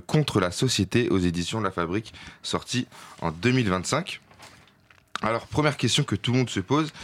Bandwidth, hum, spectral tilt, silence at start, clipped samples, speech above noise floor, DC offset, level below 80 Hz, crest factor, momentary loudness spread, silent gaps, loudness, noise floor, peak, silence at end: 16 kHz; none; -5 dB/octave; 0.1 s; under 0.1%; 33 dB; under 0.1%; -56 dBFS; 16 dB; 10 LU; none; -25 LUFS; -58 dBFS; -10 dBFS; 0 s